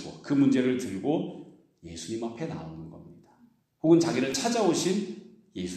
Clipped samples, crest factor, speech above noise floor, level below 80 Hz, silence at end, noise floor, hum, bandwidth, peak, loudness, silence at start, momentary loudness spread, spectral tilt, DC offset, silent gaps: under 0.1%; 20 dB; 35 dB; -64 dBFS; 0 s; -62 dBFS; none; 13.5 kHz; -8 dBFS; -27 LUFS; 0 s; 21 LU; -5 dB/octave; under 0.1%; none